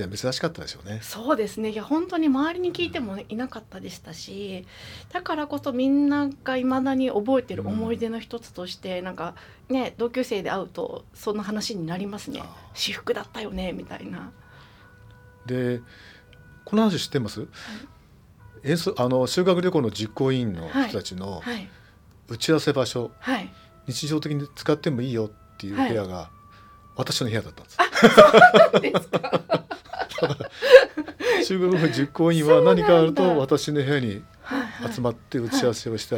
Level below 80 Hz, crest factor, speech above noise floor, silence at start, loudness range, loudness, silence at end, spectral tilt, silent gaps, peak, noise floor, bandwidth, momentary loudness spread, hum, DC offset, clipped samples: -54 dBFS; 24 dB; 30 dB; 0 s; 13 LU; -22 LUFS; 0 s; -5.5 dB/octave; none; 0 dBFS; -52 dBFS; 18.5 kHz; 19 LU; none; under 0.1%; under 0.1%